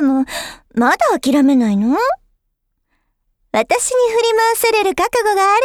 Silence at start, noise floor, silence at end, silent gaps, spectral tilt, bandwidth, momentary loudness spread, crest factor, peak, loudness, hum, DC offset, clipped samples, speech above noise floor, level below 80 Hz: 0 s; -70 dBFS; 0 s; none; -3.5 dB/octave; 18.5 kHz; 8 LU; 14 dB; 0 dBFS; -15 LUFS; none; under 0.1%; under 0.1%; 56 dB; -50 dBFS